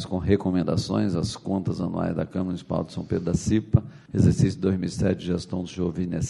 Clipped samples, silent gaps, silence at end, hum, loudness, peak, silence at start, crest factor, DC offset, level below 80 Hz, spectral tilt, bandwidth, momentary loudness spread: under 0.1%; none; 0 s; none; -25 LUFS; -4 dBFS; 0 s; 22 dB; under 0.1%; -44 dBFS; -7 dB/octave; 11.5 kHz; 7 LU